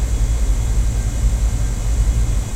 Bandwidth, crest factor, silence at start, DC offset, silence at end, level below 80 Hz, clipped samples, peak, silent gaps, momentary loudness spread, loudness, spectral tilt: 13.5 kHz; 12 dB; 0 s; under 0.1%; 0 s; -18 dBFS; under 0.1%; -6 dBFS; none; 2 LU; -20 LUFS; -5.5 dB/octave